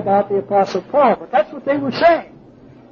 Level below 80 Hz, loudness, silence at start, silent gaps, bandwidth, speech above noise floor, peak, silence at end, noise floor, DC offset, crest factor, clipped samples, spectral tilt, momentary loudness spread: -54 dBFS; -17 LUFS; 0 s; none; 7 kHz; 27 dB; -2 dBFS; 0.65 s; -43 dBFS; under 0.1%; 14 dB; under 0.1%; -6.5 dB/octave; 6 LU